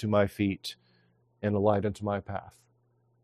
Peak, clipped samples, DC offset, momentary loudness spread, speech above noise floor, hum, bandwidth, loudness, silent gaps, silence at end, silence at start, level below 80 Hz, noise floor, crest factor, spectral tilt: -10 dBFS; under 0.1%; under 0.1%; 14 LU; 41 dB; none; 14 kHz; -30 LUFS; none; 0.75 s; 0 s; -64 dBFS; -69 dBFS; 20 dB; -7 dB/octave